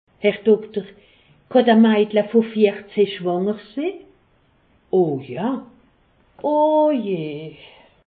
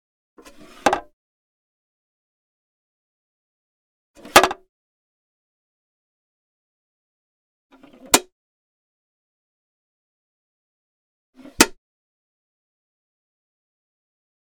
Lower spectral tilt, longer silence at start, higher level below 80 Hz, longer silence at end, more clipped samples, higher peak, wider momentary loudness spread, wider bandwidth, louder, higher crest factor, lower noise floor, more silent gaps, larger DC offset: first, -11.5 dB/octave vs -1 dB/octave; second, 0.2 s vs 0.85 s; second, -64 dBFS vs -56 dBFS; second, 0.6 s vs 2.7 s; neither; second, -4 dBFS vs 0 dBFS; first, 15 LU vs 10 LU; second, 4.7 kHz vs 19.5 kHz; about the same, -19 LUFS vs -18 LUFS; second, 18 dB vs 28 dB; first, -59 dBFS vs -45 dBFS; second, none vs 1.13-4.14 s, 4.69-7.70 s, 8.32-11.33 s; neither